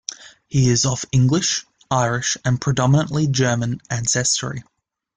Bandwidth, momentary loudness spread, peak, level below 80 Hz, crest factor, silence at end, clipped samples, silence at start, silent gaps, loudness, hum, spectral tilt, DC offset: 9.6 kHz; 7 LU; -4 dBFS; -48 dBFS; 16 dB; 0.55 s; under 0.1%; 0.1 s; none; -19 LUFS; none; -4.5 dB/octave; under 0.1%